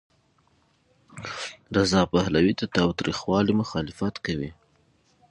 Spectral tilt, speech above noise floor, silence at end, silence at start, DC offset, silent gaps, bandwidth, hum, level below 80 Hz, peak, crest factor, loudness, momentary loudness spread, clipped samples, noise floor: -5.5 dB/octave; 41 dB; 0.8 s; 1.15 s; under 0.1%; none; 11 kHz; none; -48 dBFS; -6 dBFS; 20 dB; -25 LUFS; 13 LU; under 0.1%; -65 dBFS